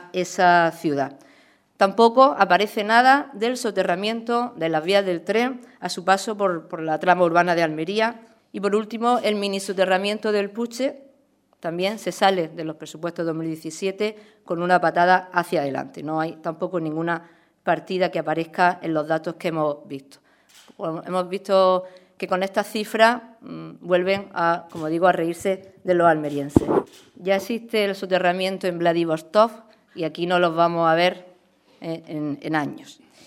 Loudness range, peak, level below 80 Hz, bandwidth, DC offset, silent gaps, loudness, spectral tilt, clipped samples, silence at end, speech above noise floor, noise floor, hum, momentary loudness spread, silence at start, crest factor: 6 LU; 0 dBFS; -58 dBFS; 16 kHz; under 0.1%; none; -22 LUFS; -5 dB/octave; under 0.1%; 0.35 s; 40 dB; -62 dBFS; none; 13 LU; 0 s; 22 dB